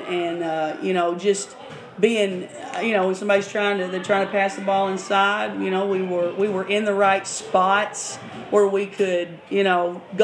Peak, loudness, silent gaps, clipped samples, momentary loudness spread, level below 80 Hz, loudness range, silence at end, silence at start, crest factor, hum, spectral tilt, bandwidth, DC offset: -4 dBFS; -22 LUFS; none; under 0.1%; 7 LU; -74 dBFS; 2 LU; 0 s; 0 s; 18 dB; none; -4 dB/octave; 11 kHz; under 0.1%